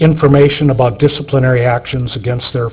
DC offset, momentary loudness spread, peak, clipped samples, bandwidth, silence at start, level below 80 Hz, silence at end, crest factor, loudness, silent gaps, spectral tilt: under 0.1%; 9 LU; 0 dBFS; under 0.1%; 4 kHz; 0 s; -36 dBFS; 0 s; 12 dB; -12 LUFS; none; -11.5 dB/octave